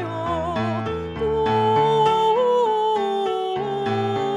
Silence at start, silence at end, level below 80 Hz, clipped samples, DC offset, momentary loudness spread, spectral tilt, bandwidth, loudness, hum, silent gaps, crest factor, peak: 0 s; 0 s; -46 dBFS; under 0.1%; under 0.1%; 7 LU; -6.5 dB/octave; 11 kHz; -21 LUFS; none; none; 14 dB; -6 dBFS